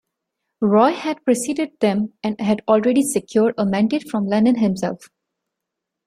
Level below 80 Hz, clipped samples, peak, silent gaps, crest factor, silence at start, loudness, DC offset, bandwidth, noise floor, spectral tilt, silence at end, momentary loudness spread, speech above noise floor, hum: -62 dBFS; under 0.1%; -2 dBFS; none; 18 dB; 0.6 s; -19 LUFS; under 0.1%; 15 kHz; -82 dBFS; -5.5 dB/octave; 1 s; 8 LU; 63 dB; none